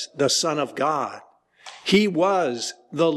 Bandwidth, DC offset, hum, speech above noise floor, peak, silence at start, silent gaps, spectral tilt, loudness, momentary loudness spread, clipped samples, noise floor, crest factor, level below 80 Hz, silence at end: 13 kHz; under 0.1%; none; 24 dB; -8 dBFS; 0 s; none; -3.5 dB/octave; -22 LUFS; 12 LU; under 0.1%; -46 dBFS; 16 dB; -66 dBFS; 0 s